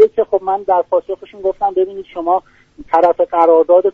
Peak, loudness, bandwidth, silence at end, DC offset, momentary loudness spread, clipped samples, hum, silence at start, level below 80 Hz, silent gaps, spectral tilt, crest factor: 0 dBFS; -15 LUFS; 4.7 kHz; 0.05 s; under 0.1%; 10 LU; under 0.1%; none; 0 s; -52 dBFS; none; -7 dB/octave; 14 dB